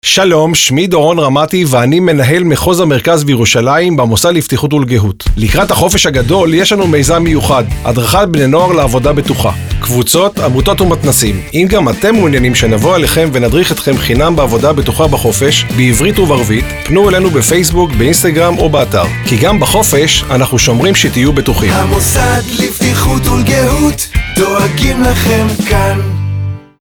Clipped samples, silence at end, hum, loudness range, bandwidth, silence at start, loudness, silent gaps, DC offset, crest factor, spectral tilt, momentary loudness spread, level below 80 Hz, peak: under 0.1%; 0.2 s; none; 2 LU; over 20 kHz; 0.05 s; -9 LUFS; none; under 0.1%; 10 dB; -4.5 dB/octave; 4 LU; -22 dBFS; 0 dBFS